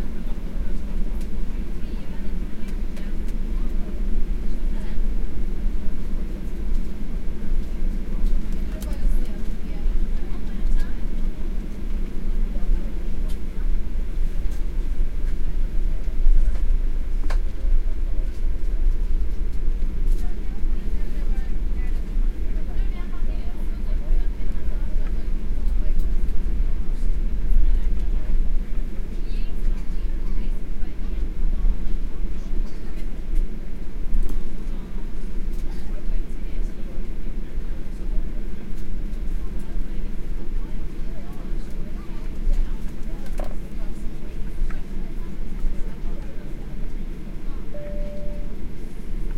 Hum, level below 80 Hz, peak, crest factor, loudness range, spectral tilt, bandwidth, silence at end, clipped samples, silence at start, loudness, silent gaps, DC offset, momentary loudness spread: none; -22 dBFS; -4 dBFS; 14 dB; 6 LU; -7.5 dB/octave; 4.1 kHz; 0 s; under 0.1%; 0 s; -31 LUFS; none; under 0.1%; 7 LU